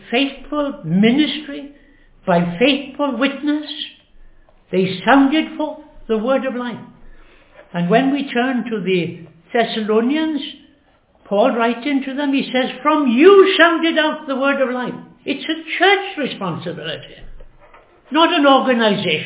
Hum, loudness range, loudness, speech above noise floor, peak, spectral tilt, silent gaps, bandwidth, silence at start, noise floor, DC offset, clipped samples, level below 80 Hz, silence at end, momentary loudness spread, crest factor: none; 6 LU; -17 LUFS; 38 dB; 0 dBFS; -9.5 dB/octave; none; 4 kHz; 0.05 s; -55 dBFS; under 0.1%; under 0.1%; -52 dBFS; 0 s; 15 LU; 18 dB